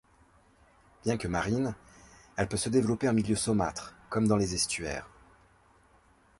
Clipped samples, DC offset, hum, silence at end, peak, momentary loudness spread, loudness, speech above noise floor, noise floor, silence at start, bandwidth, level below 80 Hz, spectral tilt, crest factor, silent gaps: under 0.1%; under 0.1%; none; 1.3 s; -12 dBFS; 11 LU; -30 LUFS; 34 dB; -63 dBFS; 1.05 s; 11.5 kHz; -52 dBFS; -5 dB/octave; 20 dB; none